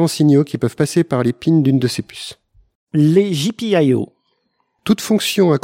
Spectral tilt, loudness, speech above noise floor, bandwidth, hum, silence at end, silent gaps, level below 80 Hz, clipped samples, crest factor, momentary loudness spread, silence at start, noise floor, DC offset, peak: -6 dB/octave; -16 LUFS; 52 dB; 16.5 kHz; none; 0.05 s; 2.75-2.87 s; -56 dBFS; under 0.1%; 14 dB; 13 LU; 0 s; -67 dBFS; under 0.1%; -2 dBFS